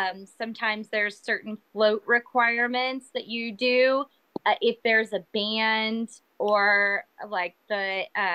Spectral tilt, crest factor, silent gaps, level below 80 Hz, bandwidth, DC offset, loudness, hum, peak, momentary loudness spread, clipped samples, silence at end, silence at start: -4 dB/octave; 16 dB; none; -80 dBFS; 10 kHz; under 0.1%; -25 LUFS; none; -10 dBFS; 11 LU; under 0.1%; 0 s; 0 s